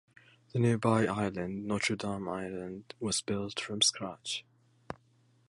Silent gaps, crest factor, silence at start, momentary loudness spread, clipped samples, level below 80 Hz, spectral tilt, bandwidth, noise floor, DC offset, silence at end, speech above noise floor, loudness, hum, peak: none; 22 dB; 0.55 s; 15 LU; under 0.1%; -62 dBFS; -4 dB/octave; 11.5 kHz; -67 dBFS; under 0.1%; 0.55 s; 35 dB; -32 LUFS; none; -12 dBFS